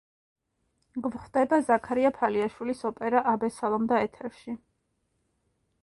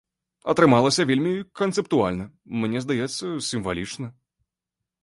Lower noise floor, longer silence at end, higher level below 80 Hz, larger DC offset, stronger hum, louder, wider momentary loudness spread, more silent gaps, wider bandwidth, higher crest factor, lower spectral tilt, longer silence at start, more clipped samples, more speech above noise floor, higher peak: second, -75 dBFS vs -86 dBFS; first, 1.25 s vs 0.9 s; second, -64 dBFS vs -54 dBFS; neither; neither; second, -27 LUFS vs -23 LUFS; about the same, 16 LU vs 16 LU; neither; about the same, 11.5 kHz vs 11.5 kHz; about the same, 20 dB vs 20 dB; about the same, -6 dB/octave vs -5 dB/octave; first, 0.95 s vs 0.45 s; neither; second, 49 dB vs 63 dB; second, -10 dBFS vs -4 dBFS